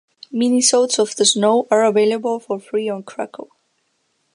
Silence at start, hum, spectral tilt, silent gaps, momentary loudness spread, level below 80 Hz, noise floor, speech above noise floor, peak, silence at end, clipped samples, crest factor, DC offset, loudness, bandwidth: 0.3 s; none; -2.5 dB/octave; none; 15 LU; -76 dBFS; -67 dBFS; 50 dB; 0 dBFS; 0.9 s; under 0.1%; 18 dB; under 0.1%; -17 LUFS; 11.5 kHz